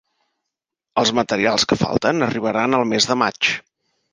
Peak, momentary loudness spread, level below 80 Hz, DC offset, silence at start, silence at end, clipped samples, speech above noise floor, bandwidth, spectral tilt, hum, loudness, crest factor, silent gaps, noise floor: -2 dBFS; 3 LU; -52 dBFS; under 0.1%; 0.95 s; 0.55 s; under 0.1%; 64 dB; 10 kHz; -3.5 dB/octave; none; -18 LUFS; 18 dB; none; -82 dBFS